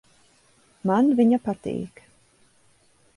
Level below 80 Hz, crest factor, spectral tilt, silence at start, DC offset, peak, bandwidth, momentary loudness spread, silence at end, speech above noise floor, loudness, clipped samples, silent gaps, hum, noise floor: -64 dBFS; 18 dB; -8 dB/octave; 0.85 s; under 0.1%; -8 dBFS; 11 kHz; 14 LU; 1.3 s; 39 dB; -23 LUFS; under 0.1%; none; none; -60 dBFS